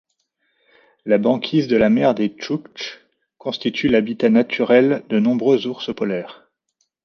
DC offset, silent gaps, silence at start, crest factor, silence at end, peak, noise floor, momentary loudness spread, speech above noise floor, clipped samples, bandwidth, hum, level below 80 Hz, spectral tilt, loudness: under 0.1%; none; 1.05 s; 18 dB; 0.7 s; -2 dBFS; -71 dBFS; 15 LU; 53 dB; under 0.1%; 6.6 kHz; none; -58 dBFS; -7 dB/octave; -18 LUFS